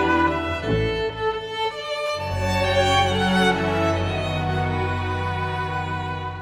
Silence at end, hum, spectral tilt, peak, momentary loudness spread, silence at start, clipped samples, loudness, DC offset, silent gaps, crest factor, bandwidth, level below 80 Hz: 0 s; none; -5.5 dB/octave; -6 dBFS; 7 LU; 0 s; under 0.1%; -23 LUFS; under 0.1%; none; 16 dB; 16 kHz; -40 dBFS